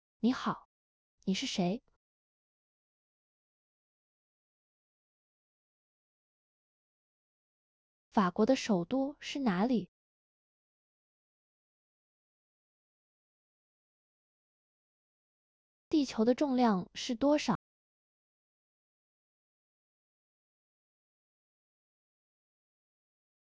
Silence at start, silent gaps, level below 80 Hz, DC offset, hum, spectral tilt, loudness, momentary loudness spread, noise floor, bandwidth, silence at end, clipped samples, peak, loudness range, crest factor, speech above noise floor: 0.25 s; 0.65-1.18 s, 1.96-8.11 s, 9.88-15.91 s; -72 dBFS; under 0.1%; none; -5.5 dB/octave; -32 LUFS; 9 LU; under -90 dBFS; 8 kHz; 6 s; under 0.1%; -16 dBFS; 8 LU; 22 dB; over 59 dB